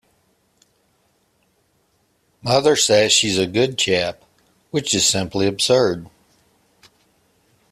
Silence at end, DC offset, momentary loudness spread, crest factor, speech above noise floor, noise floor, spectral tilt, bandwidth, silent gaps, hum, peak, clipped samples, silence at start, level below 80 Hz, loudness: 1.65 s; under 0.1%; 11 LU; 20 dB; 46 dB; -64 dBFS; -3 dB/octave; 15 kHz; none; none; -2 dBFS; under 0.1%; 2.45 s; -56 dBFS; -17 LUFS